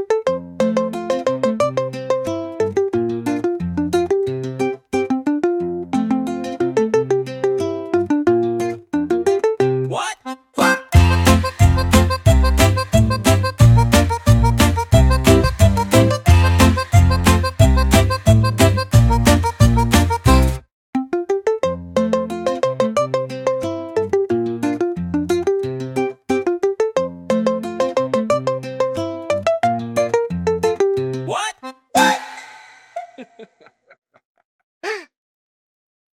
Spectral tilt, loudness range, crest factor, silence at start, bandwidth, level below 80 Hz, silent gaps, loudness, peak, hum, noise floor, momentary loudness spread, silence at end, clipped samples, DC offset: -6 dB/octave; 7 LU; 16 dB; 0 s; 17 kHz; -26 dBFS; 20.72-20.93 s, 33.98-34.02 s, 34.25-34.35 s, 34.45-34.81 s; -17 LUFS; -2 dBFS; none; -51 dBFS; 10 LU; 1.1 s; under 0.1%; under 0.1%